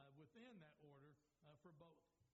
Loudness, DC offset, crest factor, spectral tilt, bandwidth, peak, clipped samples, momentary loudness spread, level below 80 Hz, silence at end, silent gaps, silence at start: -67 LUFS; under 0.1%; 16 dB; -5.5 dB/octave; 7.4 kHz; -52 dBFS; under 0.1%; 4 LU; under -90 dBFS; 0 s; none; 0 s